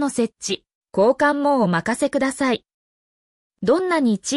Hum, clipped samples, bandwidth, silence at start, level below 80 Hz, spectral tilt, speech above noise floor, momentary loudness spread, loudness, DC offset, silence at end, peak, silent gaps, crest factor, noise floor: none; under 0.1%; 12 kHz; 0 s; -60 dBFS; -4.5 dB/octave; over 71 dB; 10 LU; -20 LUFS; under 0.1%; 0 s; -6 dBFS; 0.75-0.81 s, 2.74-3.50 s; 14 dB; under -90 dBFS